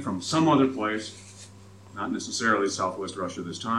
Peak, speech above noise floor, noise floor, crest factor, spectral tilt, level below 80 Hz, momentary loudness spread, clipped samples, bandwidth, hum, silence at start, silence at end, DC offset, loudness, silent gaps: -8 dBFS; 22 dB; -48 dBFS; 18 dB; -4.5 dB/octave; -68 dBFS; 22 LU; under 0.1%; 12 kHz; none; 0 s; 0 s; under 0.1%; -26 LUFS; none